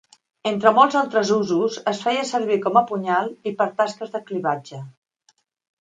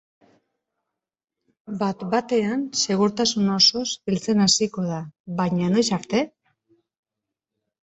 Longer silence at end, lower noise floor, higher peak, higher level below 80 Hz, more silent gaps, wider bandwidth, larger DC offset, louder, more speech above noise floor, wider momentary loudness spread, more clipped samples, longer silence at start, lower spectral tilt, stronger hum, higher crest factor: second, 0.9 s vs 1.55 s; second, -64 dBFS vs -86 dBFS; first, 0 dBFS vs -4 dBFS; second, -72 dBFS vs -62 dBFS; second, none vs 5.20-5.25 s; first, 9.4 kHz vs 8.4 kHz; neither; about the same, -21 LUFS vs -22 LUFS; second, 44 dB vs 64 dB; about the same, 12 LU vs 11 LU; neither; second, 0.45 s vs 1.7 s; about the same, -5 dB/octave vs -4 dB/octave; neither; about the same, 20 dB vs 20 dB